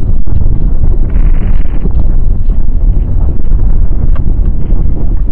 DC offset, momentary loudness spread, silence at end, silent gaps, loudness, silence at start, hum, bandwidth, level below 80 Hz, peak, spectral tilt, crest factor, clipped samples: under 0.1%; 2 LU; 0 s; none; -14 LUFS; 0 s; none; 2.2 kHz; -8 dBFS; 0 dBFS; -11.5 dB/octave; 6 dB; 0.5%